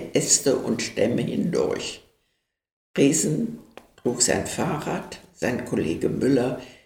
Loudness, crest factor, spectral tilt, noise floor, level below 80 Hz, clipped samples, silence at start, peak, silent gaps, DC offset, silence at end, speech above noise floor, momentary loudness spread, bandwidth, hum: -24 LUFS; 20 dB; -4 dB/octave; -75 dBFS; -54 dBFS; under 0.1%; 0 s; -4 dBFS; 2.72-2.94 s; under 0.1%; 0.1 s; 52 dB; 13 LU; 17 kHz; none